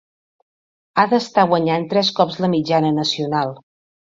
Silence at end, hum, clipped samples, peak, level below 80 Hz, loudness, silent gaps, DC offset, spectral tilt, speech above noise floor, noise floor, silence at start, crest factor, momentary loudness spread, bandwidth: 0.55 s; none; under 0.1%; 0 dBFS; -62 dBFS; -18 LUFS; none; under 0.1%; -5.5 dB/octave; over 73 dB; under -90 dBFS; 0.95 s; 20 dB; 5 LU; 7.8 kHz